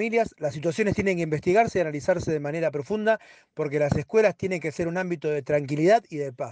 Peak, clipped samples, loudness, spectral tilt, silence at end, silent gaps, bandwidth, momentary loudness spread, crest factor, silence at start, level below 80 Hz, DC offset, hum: -8 dBFS; under 0.1%; -25 LUFS; -6.5 dB/octave; 0 s; none; 9.4 kHz; 7 LU; 16 dB; 0 s; -54 dBFS; under 0.1%; none